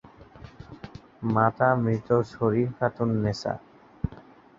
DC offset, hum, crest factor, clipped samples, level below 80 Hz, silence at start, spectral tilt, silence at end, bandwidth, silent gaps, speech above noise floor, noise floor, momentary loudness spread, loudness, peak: under 0.1%; none; 22 dB; under 0.1%; -52 dBFS; 0.35 s; -8 dB/octave; 0.35 s; 7.6 kHz; none; 25 dB; -50 dBFS; 22 LU; -26 LUFS; -6 dBFS